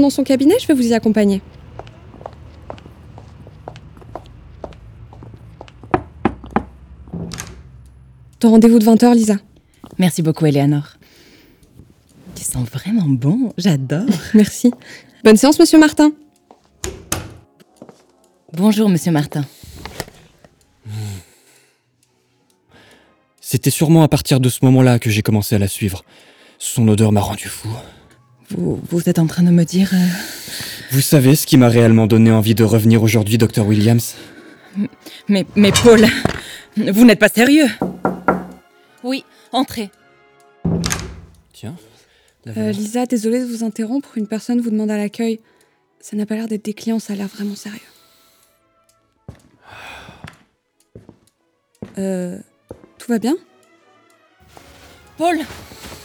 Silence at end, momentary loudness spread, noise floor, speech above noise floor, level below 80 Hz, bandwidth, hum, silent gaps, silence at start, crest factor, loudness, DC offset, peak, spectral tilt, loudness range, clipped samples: 0.05 s; 24 LU; -63 dBFS; 49 dB; -46 dBFS; over 20 kHz; none; none; 0 s; 16 dB; -15 LUFS; under 0.1%; 0 dBFS; -6 dB/octave; 15 LU; under 0.1%